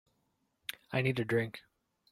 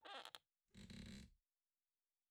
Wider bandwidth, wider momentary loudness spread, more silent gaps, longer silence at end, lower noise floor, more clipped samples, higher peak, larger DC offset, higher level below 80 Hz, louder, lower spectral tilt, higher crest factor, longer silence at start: about the same, 16 kHz vs 15 kHz; first, 13 LU vs 9 LU; neither; second, 0.5 s vs 0.95 s; second, -78 dBFS vs under -90 dBFS; neither; first, -16 dBFS vs -34 dBFS; neither; about the same, -70 dBFS vs -72 dBFS; first, -34 LUFS vs -59 LUFS; first, -6.5 dB/octave vs -4 dB/octave; second, 22 dB vs 28 dB; first, 0.7 s vs 0 s